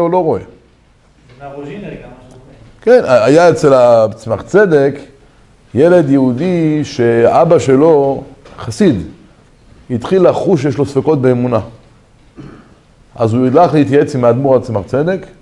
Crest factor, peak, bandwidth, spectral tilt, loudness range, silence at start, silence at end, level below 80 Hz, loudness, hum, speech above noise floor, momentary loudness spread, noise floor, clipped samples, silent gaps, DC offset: 12 dB; 0 dBFS; 11.5 kHz; -7.5 dB/octave; 4 LU; 0 s; 0.15 s; -46 dBFS; -11 LUFS; none; 37 dB; 18 LU; -48 dBFS; 0.3%; none; under 0.1%